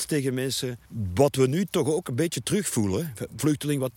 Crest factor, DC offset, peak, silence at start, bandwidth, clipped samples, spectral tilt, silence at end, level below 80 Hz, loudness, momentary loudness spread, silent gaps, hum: 20 dB; under 0.1%; -6 dBFS; 0 s; 17 kHz; under 0.1%; -5 dB/octave; 0.05 s; -56 dBFS; -26 LUFS; 7 LU; none; none